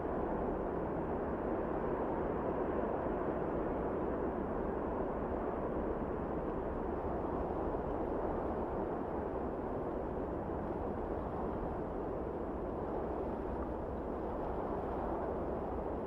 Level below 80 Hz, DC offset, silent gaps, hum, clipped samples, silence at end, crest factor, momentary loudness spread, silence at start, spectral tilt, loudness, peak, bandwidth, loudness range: -48 dBFS; under 0.1%; none; none; under 0.1%; 0 s; 14 dB; 3 LU; 0 s; -10 dB/octave; -38 LUFS; -24 dBFS; 5.8 kHz; 3 LU